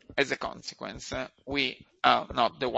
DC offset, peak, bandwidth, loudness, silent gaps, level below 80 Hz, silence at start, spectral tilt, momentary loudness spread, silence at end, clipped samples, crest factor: under 0.1%; -6 dBFS; 8.2 kHz; -29 LUFS; none; -54 dBFS; 0.1 s; -3.5 dB/octave; 14 LU; 0 s; under 0.1%; 24 dB